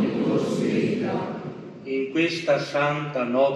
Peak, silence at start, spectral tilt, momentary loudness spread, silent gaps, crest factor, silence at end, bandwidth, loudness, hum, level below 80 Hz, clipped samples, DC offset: -8 dBFS; 0 s; -6 dB/octave; 10 LU; none; 16 dB; 0 s; 11.5 kHz; -25 LUFS; none; -68 dBFS; under 0.1%; under 0.1%